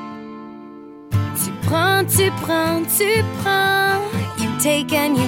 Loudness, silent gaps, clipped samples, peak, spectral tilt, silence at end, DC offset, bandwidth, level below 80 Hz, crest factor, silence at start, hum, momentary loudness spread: -18 LUFS; none; under 0.1%; -4 dBFS; -4 dB/octave; 0 s; under 0.1%; 17 kHz; -50 dBFS; 16 dB; 0 s; none; 19 LU